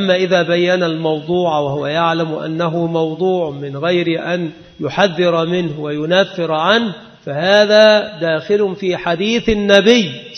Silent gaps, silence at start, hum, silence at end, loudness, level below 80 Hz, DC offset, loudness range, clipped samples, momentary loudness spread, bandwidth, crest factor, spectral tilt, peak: none; 0 s; none; 0 s; -15 LUFS; -46 dBFS; under 0.1%; 4 LU; under 0.1%; 11 LU; 6.6 kHz; 14 dB; -5.5 dB/octave; 0 dBFS